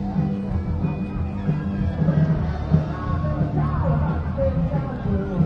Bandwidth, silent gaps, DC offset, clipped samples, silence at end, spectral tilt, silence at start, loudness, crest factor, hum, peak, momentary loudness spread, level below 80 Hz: 5.8 kHz; none; under 0.1%; under 0.1%; 0 s; -10.5 dB/octave; 0 s; -23 LUFS; 18 dB; none; -4 dBFS; 5 LU; -32 dBFS